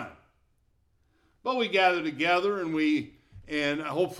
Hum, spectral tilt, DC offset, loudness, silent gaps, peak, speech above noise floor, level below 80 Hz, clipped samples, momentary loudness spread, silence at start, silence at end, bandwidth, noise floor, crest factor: none; -5 dB/octave; under 0.1%; -27 LUFS; none; -10 dBFS; 42 dB; -64 dBFS; under 0.1%; 12 LU; 0 s; 0 s; 13 kHz; -69 dBFS; 18 dB